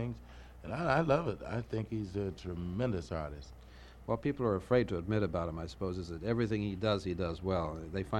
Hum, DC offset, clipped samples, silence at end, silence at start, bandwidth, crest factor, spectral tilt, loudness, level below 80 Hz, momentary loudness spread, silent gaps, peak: none; under 0.1%; under 0.1%; 0 s; 0 s; 11 kHz; 20 dB; -7.5 dB/octave; -35 LUFS; -52 dBFS; 15 LU; none; -16 dBFS